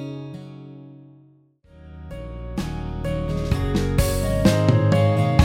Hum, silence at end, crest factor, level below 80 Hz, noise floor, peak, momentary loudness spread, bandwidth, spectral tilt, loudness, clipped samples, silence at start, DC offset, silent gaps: none; 0 s; 20 dB; -32 dBFS; -55 dBFS; -2 dBFS; 22 LU; 16.5 kHz; -6.5 dB/octave; -22 LUFS; under 0.1%; 0 s; under 0.1%; none